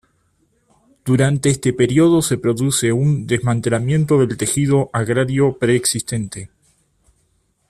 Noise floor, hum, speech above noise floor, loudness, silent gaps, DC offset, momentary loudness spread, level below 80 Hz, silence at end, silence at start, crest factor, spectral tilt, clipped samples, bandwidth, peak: -63 dBFS; none; 47 dB; -17 LUFS; none; under 0.1%; 6 LU; -50 dBFS; 1.25 s; 1.05 s; 14 dB; -5.5 dB/octave; under 0.1%; 14.5 kHz; -4 dBFS